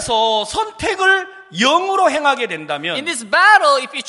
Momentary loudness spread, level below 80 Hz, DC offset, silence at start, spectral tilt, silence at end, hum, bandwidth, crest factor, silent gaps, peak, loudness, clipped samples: 11 LU; -50 dBFS; under 0.1%; 0 s; -2 dB/octave; 0 s; none; 11.5 kHz; 16 dB; none; 0 dBFS; -15 LUFS; under 0.1%